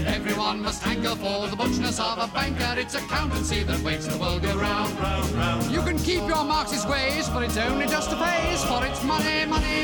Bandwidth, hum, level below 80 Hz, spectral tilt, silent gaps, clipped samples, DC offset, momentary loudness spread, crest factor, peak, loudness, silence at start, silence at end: 19 kHz; none; -34 dBFS; -4 dB/octave; none; under 0.1%; under 0.1%; 3 LU; 14 dB; -10 dBFS; -25 LUFS; 0 s; 0 s